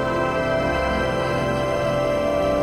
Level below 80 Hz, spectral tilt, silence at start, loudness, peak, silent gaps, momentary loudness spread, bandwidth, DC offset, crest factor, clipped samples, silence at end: -36 dBFS; -6 dB/octave; 0 s; -22 LUFS; -10 dBFS; none; 1 LU; 13.5 kHz; under 0.1%; 12 dB; under 0.1%; 0 s